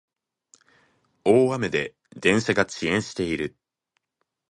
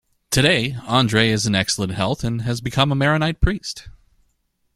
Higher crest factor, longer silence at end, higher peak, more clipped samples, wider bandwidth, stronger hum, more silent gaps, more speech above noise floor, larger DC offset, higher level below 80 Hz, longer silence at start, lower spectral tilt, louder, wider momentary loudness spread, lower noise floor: about the same, 20 dB vs 18 dB; first, 1 s vs 0.85 s; about the same, -4 dBFS vs -2 dBFS; neither; second, 11 kHz vs 15 kHz; neither; neither; first, 56 dB vs 49 dB; neither; second, -56 dBFS vs -34 dBFS; first, 1.25 s vs 0.3 s; about the same, -5 dB/octave vs -4.5 dB/octave; second, -23 LUFS vs -19 LUFS; about the same, 9 LU vs 7 LU; first, -79 dBFS vs -68 dBFS